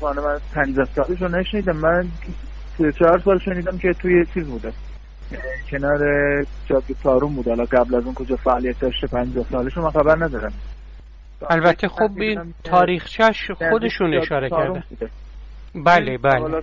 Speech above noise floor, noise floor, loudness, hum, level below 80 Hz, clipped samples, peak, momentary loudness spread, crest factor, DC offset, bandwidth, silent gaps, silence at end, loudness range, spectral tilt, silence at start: 20 dB; -40 dBFS; -20 LUFS; none; -34 dBFS; under 0.1%; -2 dBFS; 16 LU; 16 dB; 0.2%; 7.6 kHz; none; 0 s; 2 LU; -7.5 dB/octave; 0 s